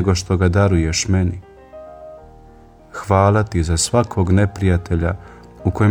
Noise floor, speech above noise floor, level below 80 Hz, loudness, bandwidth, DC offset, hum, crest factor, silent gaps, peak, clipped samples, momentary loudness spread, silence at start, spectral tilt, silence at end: -44 dBFS; 28 dB; -32 dBFS; -17 LUFS; 11.5 kHz; under 0.1%; none; 18 dB; none; 0 dBFS; under 0.1%; 20 LU; 0 s; -5.5 dB/octave; 0 s